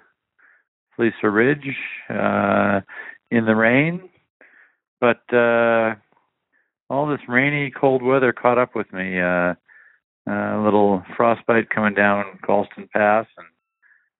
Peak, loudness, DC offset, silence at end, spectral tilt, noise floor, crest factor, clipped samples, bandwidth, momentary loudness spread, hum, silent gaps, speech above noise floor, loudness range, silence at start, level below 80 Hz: 0 dBFS; -19 LUFS; under 0.1%; 0.75 s; -5 dB/octave; -69 dBFS; 20 dB; under 0.1%; 4 kHz; 10 LU; none; 4.30-4.40 s, 4.88-4.97 s, 6.82-6.87 s, 10.04-10.25 s; 50 dB; 2 LU; 1 s; -62 dBFS